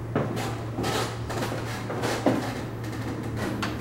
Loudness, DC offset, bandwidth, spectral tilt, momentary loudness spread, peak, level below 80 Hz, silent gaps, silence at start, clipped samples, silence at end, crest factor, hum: -29 LUFS; under 0.1%; 16 kHz; -5.5 dB/octave; 7 LU; -8 dBFS; -46 dBFS; none; 0 s; under 0.1%; 0 s; 22 dB; none